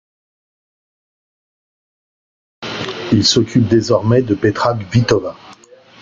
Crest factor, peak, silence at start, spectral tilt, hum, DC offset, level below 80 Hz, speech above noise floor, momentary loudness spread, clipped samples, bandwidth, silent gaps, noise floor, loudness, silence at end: 18 dB; 0 dBFS; 2.6 s; -5.5 dB/octave; none; under 0.1%; -48 dBFS; 29 dB; 12 LU; under 0.1%; 7.6 kHz; none; -43 dBFS; -15 LUFS; 0.5 s